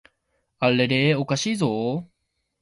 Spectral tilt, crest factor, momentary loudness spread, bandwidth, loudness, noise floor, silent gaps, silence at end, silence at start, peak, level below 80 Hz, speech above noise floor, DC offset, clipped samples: -5 dB/octave; 18 dB; 8 LU; 11.5 kHz; -22 LUFS; -73 dBFS; none; 0.55 s; 0.6 s; -6 dBFS; -62 dBFS; 51 dB; under 0.1%; under 0.1%